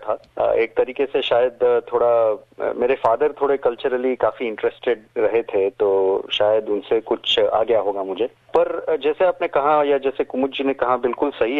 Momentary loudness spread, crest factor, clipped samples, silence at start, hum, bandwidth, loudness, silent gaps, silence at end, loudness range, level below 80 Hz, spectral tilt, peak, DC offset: 6 LU; 16 dB; under 0.1%; 0 s; none; 7.2 kHz; -20 LUFS; none; 0 s; 1 LU; -56 dBFS; -5.5 dB/octave; -4 dBFS; under 0.1%